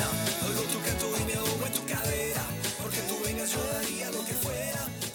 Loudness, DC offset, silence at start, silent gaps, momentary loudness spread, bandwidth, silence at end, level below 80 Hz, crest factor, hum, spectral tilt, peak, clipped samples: -30 LUFS; under 0.1%; 0 s; none; 3 LU; over 20 kHz; 0 s; -50 dBFS; 18 dB; none; -3 dB/octave; -14 dBFS; under 0.1%